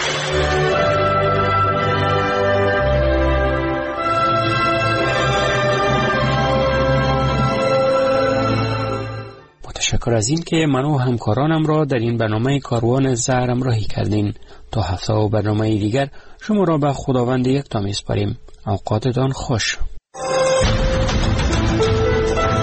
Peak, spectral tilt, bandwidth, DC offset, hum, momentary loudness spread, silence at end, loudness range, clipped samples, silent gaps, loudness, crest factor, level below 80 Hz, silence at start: -6 dBFS; -5.5 dB/octave; 8.6 kHz; under 0.1%; none; 6 LU; 0 s; 3 LU; under 0.1%; none; -18 LUFS; 12 dB; -30 dBFS; 0 s